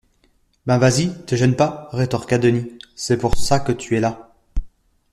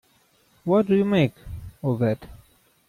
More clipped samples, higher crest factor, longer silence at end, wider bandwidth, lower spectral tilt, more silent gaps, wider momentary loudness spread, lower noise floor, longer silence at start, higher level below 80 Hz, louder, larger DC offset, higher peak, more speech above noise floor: neither; about the same, 18 dB vs 16 dB; about the same, 0.45 s vs 0.5 s; second, 13 kHz vs 15 kHz; second, -5.5 dB/octave vs -8.5 dB/octave; neither; about the same, 17 LU vs 16 LU; about the same, -61 dBFS vs -62 dBFS; about the same, 0.65 s vs 0.65 s; first, -34 dBFS vs -50 dBFS; first, -19 LUFS vs -23 LUFS; neither; first, -2 dBFS vs -8 dBFS; about the same, 43 dB vs 41 dB